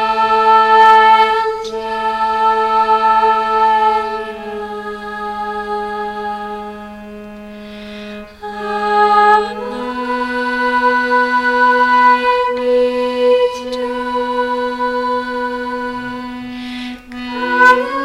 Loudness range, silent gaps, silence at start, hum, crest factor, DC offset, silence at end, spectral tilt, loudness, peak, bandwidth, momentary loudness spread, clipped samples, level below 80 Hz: 12 LU; none; 0 s; none; 14 dB; under 0.1%; 0 s; -4 dB/octave; -14 LUFS; 0 dBFS; 12 kHz; 18 LU; under 0.1%; -46 dBFS